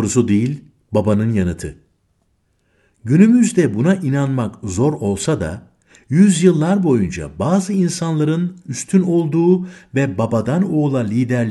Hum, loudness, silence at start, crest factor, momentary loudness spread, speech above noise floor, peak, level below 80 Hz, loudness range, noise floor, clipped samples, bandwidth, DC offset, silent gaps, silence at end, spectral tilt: none; -17 LUFS; 0 s; 16 dB; 10 LU; 48 dB; 0 dBFS; -46 dBFS; 1 LU; -63 dBFS; under 0.1%; 12 kHz; under 0.1%; none; 0 s; -7 dB/octave